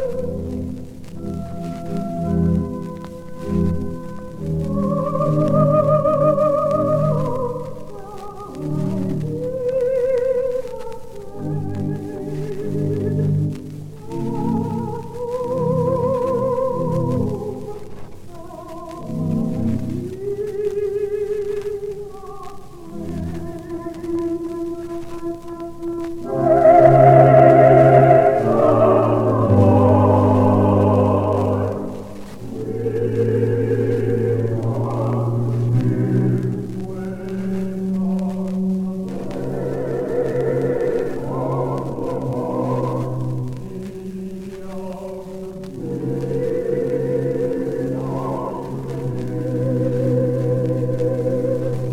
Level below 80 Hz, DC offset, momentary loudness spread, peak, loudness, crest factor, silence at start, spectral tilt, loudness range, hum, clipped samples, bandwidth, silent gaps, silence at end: -44 dBFS; under 0.1%; 17 LU; 0 dBFS; -19 LUFS; 18 dB; 0 s; -9.5 dB/octave; 13 LU; none; under 0.1%; 14 kHz; none; 0 s